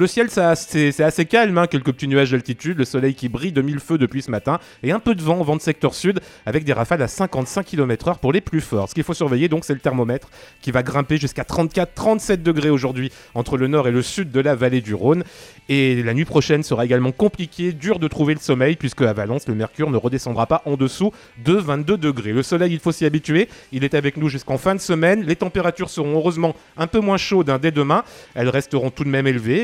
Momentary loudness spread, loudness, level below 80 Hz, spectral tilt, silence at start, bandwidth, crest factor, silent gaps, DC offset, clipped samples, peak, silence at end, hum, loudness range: 6 LU; -20 LUFS; -46 dBFS; -6 dB/octave; 0 s; 15.5 kHz; 18 dB; none; under 0.1%; under 0.1%; -2 dBFS; 0 s; none; 2 LU